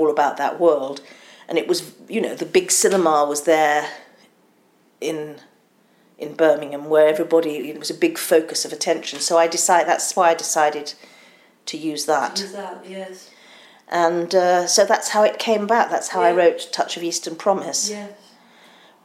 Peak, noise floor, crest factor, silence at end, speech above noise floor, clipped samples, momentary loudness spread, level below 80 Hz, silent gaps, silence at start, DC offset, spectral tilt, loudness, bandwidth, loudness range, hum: -2 dBFS; -58 dBFS; 18 dB; 0.9 s; 39 dB; under 0.1%; 16 LU; -72 dBFS; none; 0 s; under 0.1%; -2.5 dB/octave; -19 LUFS; 16 kHz; 6 LU; none